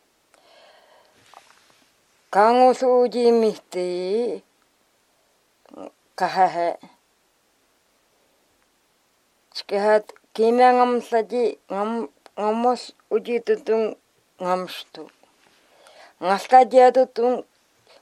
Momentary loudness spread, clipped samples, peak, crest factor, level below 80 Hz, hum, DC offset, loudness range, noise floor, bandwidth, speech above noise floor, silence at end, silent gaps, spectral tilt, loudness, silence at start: 20 LU; under 0.1%; -2 dBFS; 20 dB; -80 dBFS; none; under 0.1%; 8 LU; -65 dBFS; 12.5 kHz; 45 dB; 0.6 s; none; -5 dB/octave; -20 LUFS; 2.3 s